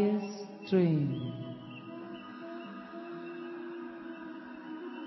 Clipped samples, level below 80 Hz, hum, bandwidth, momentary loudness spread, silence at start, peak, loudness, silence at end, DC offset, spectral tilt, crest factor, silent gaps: under 0.1%; -74 dBFS; none; 6 kHz; 16 LU; 0 s; -16 dBFS; -37 LUFS; 0 s; under 0.1%; -8 dB/octave; 20 dB; none